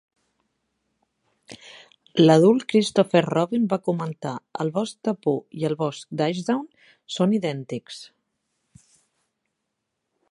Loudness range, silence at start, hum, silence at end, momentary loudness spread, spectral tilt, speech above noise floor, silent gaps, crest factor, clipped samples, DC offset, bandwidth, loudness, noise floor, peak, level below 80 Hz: 9 LU; 1.5 s; none; 2.25 s; 18 LU; -6.5 dB/octave; 58 dB; none; 22 dB; under 0.1%; under 0.1%; 11.5 kHz; -23 LUFS; -80 dBFS; -2 dBFS; -72 dBFS